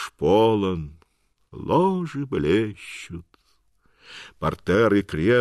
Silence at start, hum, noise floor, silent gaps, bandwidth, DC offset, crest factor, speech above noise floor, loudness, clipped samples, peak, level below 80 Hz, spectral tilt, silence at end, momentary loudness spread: 0 s; none; -64 dBFS; none; 12.5 kHz; under 0.1%; 16 dB; 42 dB; -22 LUFS; under 0.1%; -8 dBFS; -48 dBFS; -7 dB/octave; 0 s; 21 LU